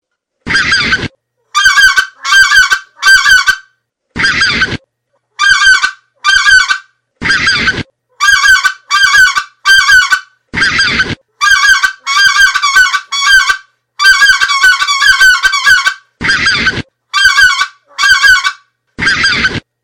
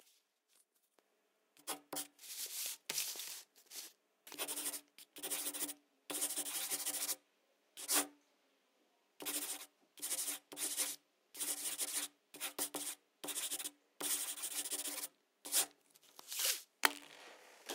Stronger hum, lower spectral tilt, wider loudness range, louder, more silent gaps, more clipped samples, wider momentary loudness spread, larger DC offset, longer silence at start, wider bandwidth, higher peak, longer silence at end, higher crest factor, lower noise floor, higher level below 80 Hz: neither; first, 0 dB/octave vs 1.5 dB/octave; second, 2 LU vs 5 LU; first, -7 LUFS vs -40 LUFS; neither; first, 0.5% vs under 0.1%; second, 10 LU vs 16 LU; neither; second, 0.45 s vs 1.65 s; about the same, 18 kHz vs 16.5 kHz; first, 0 dBFS vs -8 dBFS; first, 0.25 s vs 0 s; second, 10 dB vs 36 dB; second, -63 dBFS vs -80 dBFS; first, -36 dBFS vs under -90 dBFS